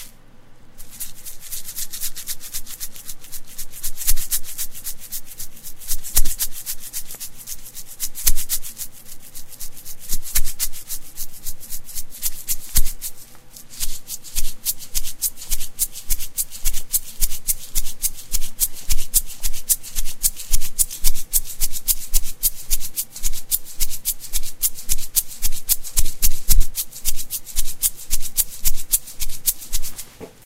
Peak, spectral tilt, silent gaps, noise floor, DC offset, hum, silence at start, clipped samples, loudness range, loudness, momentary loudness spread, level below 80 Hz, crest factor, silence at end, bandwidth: 0 dBFS; -0.5 dB/octave; none; -41 dBFS; under 0.1%; none; 0 s; under 0.1%; 6 LU; -24 LUFS; 13 LU; -26 dBFS; 16 dB; 0.2 s; 16.5 kHz